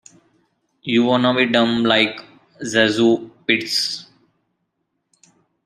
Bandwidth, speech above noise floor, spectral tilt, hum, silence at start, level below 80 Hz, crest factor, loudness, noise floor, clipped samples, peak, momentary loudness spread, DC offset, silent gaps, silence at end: 14 kHz; 56 dB; -4 dB/octave; none; 0.85 s; -64 dBFS; 20 dB; -17 LUFS; -73 dBFS; under 0.1%; -2 dBFS; 13 LU; under 0.1%; none; 1.65 s